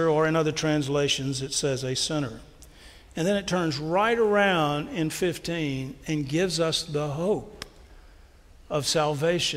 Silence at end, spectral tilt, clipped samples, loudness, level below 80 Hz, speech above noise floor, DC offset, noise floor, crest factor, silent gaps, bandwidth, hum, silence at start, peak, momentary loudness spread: 0 s; -4.5 dB/octave; under 0.1%; -26 LUFS; -52 dBFS; 26 dB; under 0.1%; -52 dBFS; 18 dB; none; 16 kHz; none; 0 s; -10 dBFS; 9 LU